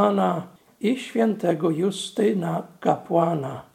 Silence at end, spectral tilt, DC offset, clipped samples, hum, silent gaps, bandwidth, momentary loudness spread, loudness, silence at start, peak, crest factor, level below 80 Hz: 0.1 s; -6.5 dB/octave; under 0.1%; under 0.1%; none; none; 15.5 kHz; 7 LU; -24 LUFS; 0 s; -4 dBFS; 18 dB; -70 dBFS